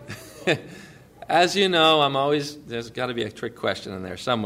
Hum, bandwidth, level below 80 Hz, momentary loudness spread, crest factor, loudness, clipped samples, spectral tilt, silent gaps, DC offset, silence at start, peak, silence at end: none; 16 kHz; -60 dBFS; 15 LU; 18 dB; -23 LUFS; under 0.1%; -4 dB/octave; none; under 0.1%; 0 s; -6 dBFS; 0 s